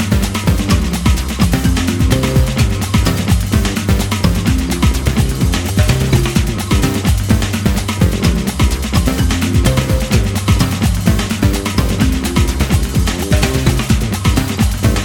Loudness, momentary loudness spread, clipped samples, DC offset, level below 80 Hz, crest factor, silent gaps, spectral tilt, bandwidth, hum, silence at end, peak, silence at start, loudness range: -15 LUFS; 2 LU; under 0.1%; under 0.1%; -18 dBFS; 14 dB; none; -5.5 dB/octave; 20 kHz; none; 0 s; 0 dBFS; 0 s; 1 LU